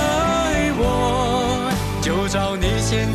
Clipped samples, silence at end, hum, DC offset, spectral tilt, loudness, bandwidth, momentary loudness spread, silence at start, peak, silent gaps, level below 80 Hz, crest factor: under 0.1%; 0 s; 50 Hz at -40 dBFS; under 0.1%; -5 dB/octave; -20 LUFS; 14 kHz; 3 LU; 0 s; -8 dBFS; none; -30 dBFS; 10 dB